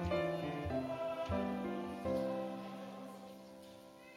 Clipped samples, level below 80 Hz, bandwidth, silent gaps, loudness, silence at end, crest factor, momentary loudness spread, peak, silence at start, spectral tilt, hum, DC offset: under 0.1%; -60 dBFS; 16.5 kHz; none; -40 LUFS; 0 s; 16 dB; 17 LU; -26 dBFS; 0 s; -7 dB/octave; none; under 0.1%